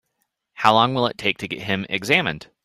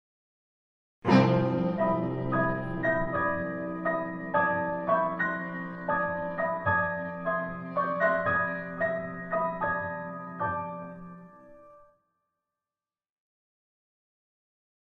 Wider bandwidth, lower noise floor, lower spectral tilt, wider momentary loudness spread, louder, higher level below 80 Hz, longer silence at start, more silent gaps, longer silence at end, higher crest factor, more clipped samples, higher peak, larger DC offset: first, 15 kHz vs 6.8 kHz; second, -74 dBFS vs under -90 dBFS; second, -4.5 dB/octave vs -8.5 dB/octave; about the same, 9 LU vs 10 LU; first, -20 LUFS vs -29 LUFS; about the same, -58 dBFS vs -54 dBFS; second, 0.6 s vs 1.05 s; neither; second, 0.2 s vs 3.2 s; about the same, 22 dB vs 22 dB; neither; first, -2 dBFS vs -10 dBFS; neither